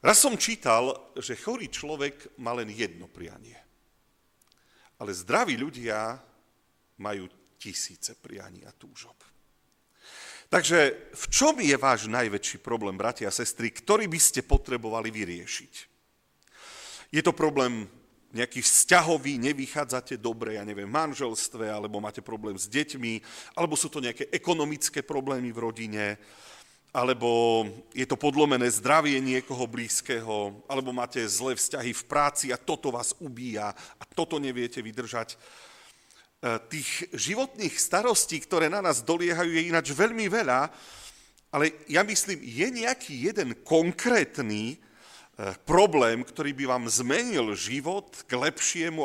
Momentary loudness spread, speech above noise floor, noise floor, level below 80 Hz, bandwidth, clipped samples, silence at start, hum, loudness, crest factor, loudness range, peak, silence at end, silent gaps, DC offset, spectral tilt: 15 LU; 41 dB; -69 dBFS; -46 dBFS; 16.5 kHz; under 0.1%; 0.05 s; none; -27 LUFS; 22 dB; 9 LU; -6 dBFS; 0 s; none; under 0.1%; -2.5 dB/octave